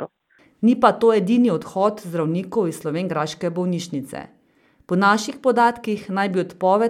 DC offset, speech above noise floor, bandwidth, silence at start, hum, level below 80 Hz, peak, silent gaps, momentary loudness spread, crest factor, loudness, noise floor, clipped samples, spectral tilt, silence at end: under 0.1%; 39 dB; 14.5 kHz; 0 s; none; -64 dBFS; 0 dBFS; none; 10 LU; 20 dB; -20 LUFS; -59 dBFS; under 0.1%; -6 dB/octave; 0 s